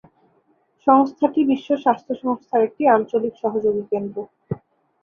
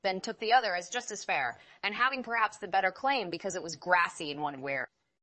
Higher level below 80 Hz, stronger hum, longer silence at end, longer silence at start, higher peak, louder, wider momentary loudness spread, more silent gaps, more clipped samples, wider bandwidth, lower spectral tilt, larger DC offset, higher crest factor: first, -62 dBFS vs -76 dBFS; neither; about the same, 0.45 s vs 0.35 s; first, 0.85 s vs 0.05 s; first, -2 dBFS vs -10 dBFS; first, -20 LUFS vs -31 LUFS; first, 16 LU vs 9 LU; neither; neither; second, 6.6 kHz vs 8.4 kHz; first, -8.5 dB/octave vs -2.5 dB/octave; neither; about the same, 18 dB vs 20 dB